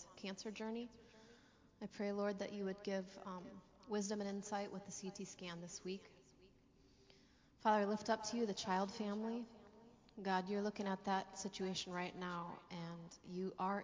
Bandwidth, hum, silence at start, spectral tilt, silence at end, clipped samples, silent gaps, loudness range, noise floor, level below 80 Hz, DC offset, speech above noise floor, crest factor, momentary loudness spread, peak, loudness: 7.6 kHz; none; 0 s; -4.5 dB/octave; 0 s; under 0.1%; none; 5 LU; -70 dBFS; -76 dBFS; under 0.1%; 26 dB; 22 dB; 14 LU; -24 dBFS; -44 LUFS